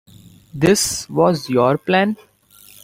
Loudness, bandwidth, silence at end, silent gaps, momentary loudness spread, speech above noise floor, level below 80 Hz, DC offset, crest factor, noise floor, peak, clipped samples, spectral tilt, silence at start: -17 LUFS; 16.5 kHz; 0.7 s; none; 8 LU; 31 dB; -50 dBFS; under 0.1%; 16 dB; -47 dBFS; -2 dBFS; under 0.1%; -4.5 dB/octave; 0.55 s